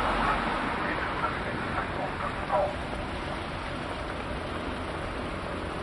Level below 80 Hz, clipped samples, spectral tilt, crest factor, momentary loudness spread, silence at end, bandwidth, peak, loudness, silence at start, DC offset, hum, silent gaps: -42 dBFS; under 0.1%; -5.5 dB/octave; 16 dB; 6 LU; 0 s; 11.5 kHz; -14 dBFS; -31 LUFS; 0 s; under 0.1%; none; none